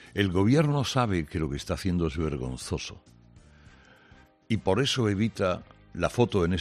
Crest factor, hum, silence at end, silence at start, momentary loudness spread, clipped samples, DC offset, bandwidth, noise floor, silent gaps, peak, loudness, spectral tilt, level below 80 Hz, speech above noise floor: 20 dB; none; 0 s; 0 s; 11 LU; under 0.1%; under 0.1%; 13.5 kHz; -56 dBFS; none; -8 dBFS; -27 LUFS; -6 dB/octave; -48 dBFS; 30 dB